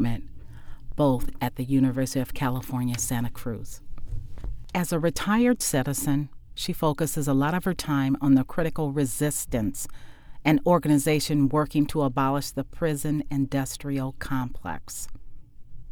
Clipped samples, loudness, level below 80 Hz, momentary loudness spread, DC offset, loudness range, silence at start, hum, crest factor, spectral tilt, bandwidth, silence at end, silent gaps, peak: under 0.1%; -26 LUFS; -40 dBFS; 15 LU; under 0.1%; 5 LU; 0 s; none; 18 dB; -5.5 dB/octave; 20 kHz; 0 s; none; -8 dBFS